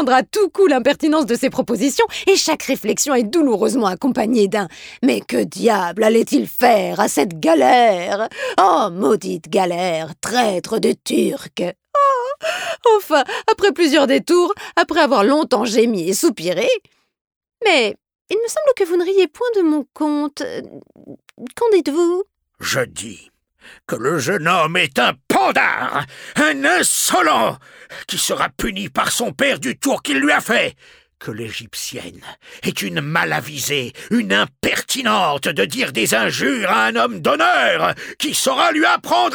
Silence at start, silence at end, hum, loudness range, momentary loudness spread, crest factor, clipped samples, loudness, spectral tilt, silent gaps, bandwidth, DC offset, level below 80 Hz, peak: 0 s; 0 s; none; 5 LU; 10 LU; 16 dB; under 0.1%; -17 LUFS; -3 dB/octave; 17.21-17.25 s, 17.36-17.41 s, 18.21-18.25 s; over 20 kHz; under 0.1%; -54 dBFS; -2 dBFS